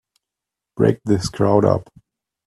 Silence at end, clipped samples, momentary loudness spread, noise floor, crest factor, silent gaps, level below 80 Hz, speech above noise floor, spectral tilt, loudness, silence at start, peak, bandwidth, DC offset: 0.65 s; under 0.1%; 7 LU; -85 dBFS; 20 dB; none; -50 dBFS; 68 dB; -7 dB/octave; -18 LUFS; 0.75 s; 0 dBFS; 12.5 kHz; under 0.1%